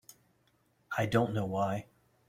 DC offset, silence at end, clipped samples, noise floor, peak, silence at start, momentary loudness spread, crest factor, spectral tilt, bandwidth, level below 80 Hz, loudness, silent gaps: under 0.1%; 0.45 s; under 0.1%; -72 dBFS; -14 dBFS; 0.9 s; 9 LU; 20 dB; -6.5 dB/octave; 16 kHz; -64 dBFS; -33 LUFS; none